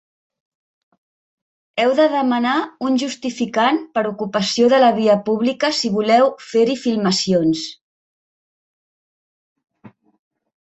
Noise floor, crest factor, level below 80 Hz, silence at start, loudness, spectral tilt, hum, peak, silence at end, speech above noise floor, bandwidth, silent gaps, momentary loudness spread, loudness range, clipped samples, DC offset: -47 dBFS; 16 dB; -64 dBFS; 1.75 s; -17 LUFS; -4.5 dB/octave; none; -2 dBFS; 0.7 s; 31 dB; 8.2 kHz; 7.81-9.56 s; 8 LU; 7 LU; under 0.1%; under 0.1%